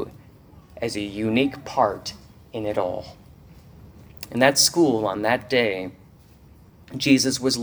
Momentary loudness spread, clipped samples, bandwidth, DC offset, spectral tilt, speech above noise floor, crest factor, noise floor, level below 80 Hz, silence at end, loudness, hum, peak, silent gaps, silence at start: 19 LU; under 0.1%; over 20 kHz; under 0.1%; -3.5 dB/octave; 28 dB; 24 dB; -50 dBFS; -54 dBFS; 0 s; -22 LUFS; none; 0 dBFS; none; 0 s